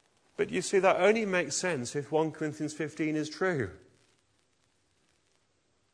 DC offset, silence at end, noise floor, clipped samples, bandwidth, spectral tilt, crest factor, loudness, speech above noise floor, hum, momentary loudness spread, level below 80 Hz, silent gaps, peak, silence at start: under 0.1%; 2.15 s; -73 dBFS; under 0.1%; 10.5 kHz; -4.5 dB/octave; 22 dB; -30 LUFS; 44 dB; none; 10 LU; -70 dBFS; none; -10 dBFS; 0.4 s